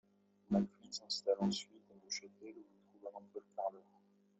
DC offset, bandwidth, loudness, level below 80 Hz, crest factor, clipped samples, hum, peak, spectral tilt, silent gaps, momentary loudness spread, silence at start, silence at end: under 0.1%; 8.2 kHz; -40 LUFS; -78 dBFS; 20 dB; under 0.1%; none; -22 dBFS; -5 dB/octave; none; 19 LU; 0.5 s; 0.6 s